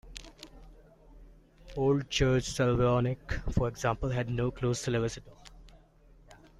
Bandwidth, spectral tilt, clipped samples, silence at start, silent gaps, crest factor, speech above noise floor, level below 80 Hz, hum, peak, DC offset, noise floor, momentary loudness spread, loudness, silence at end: 12.5 kHz; -6 dB/octave; under 0.1%; 0.05 s; none; 18 dB; 29 dB; -46 dBFS; none; -14 dBFS; under 0.1%; -58 dBFS; 19 LU; -30 LUFS; 0.25 s